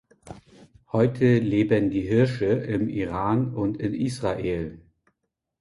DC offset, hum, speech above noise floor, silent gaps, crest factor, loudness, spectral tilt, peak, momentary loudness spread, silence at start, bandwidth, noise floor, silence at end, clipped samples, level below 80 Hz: under 0.1%; none; 56 dB; none; 18 dB; -24 LUFS; -8 dB/octave; -8 dBFS; 7 LU; 0.25 s; 11.5 kHz; -79 dBFS; 0.85 s; under 0.1%; -50 dBFS